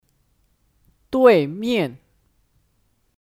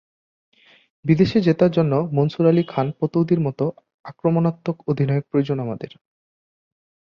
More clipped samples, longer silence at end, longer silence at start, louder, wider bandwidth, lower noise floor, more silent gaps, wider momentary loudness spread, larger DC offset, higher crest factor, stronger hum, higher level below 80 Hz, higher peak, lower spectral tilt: neither; about the same, 1.25 s vs 1.15 s; about the same, 1.1 s vs 1.05 s; about the same, -18 LUFS vs -20 LUFS; first, 14 kHz vs 6.6 kHz; second, -65 dBFS vs under -90 dBFS; second, none vs 3.94-4.04 s; first, 12 LU vs 9 LU; neither; about the same, 22 dB vs 18 dB; neither; about the same, -60 dBFS vs -56 dBFS; first, 0 dBFS vs -4 dBFS; second, -6.5 dB/octave vs -9.5 dB/octave